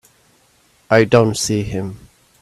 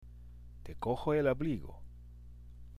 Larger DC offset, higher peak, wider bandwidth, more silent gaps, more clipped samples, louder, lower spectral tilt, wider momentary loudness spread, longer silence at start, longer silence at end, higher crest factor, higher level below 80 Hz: neither; first, 0 dBFS vs -20 dBFS; about the same, 14.5 kHz vs 14.5 kHz; neither; neither; first, -16 LUFS vs -34 LUFS; second, -5 dB/octave vs -8.5 dB/octave; second, 14 LU vs 24 LU; first, 0.9 s vs 0 s; first, 0.45 s vs 0 s; about the same, 18 dB vs 18 dB; about the same, -46 dBFS vs -50 dBFS